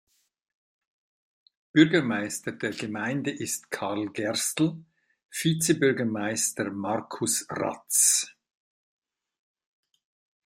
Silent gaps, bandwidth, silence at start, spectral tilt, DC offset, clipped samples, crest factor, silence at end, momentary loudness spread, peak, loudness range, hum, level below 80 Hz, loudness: 5.25-5.29 s; 16 kHz; 1.75 s; -3.5 dB/octave; under 0.1%; under 0.1%; 24 dB; 2.15 s; 11 LU; -4 dBFS; 4 LU; none; -70 dBFS; -26 LUFS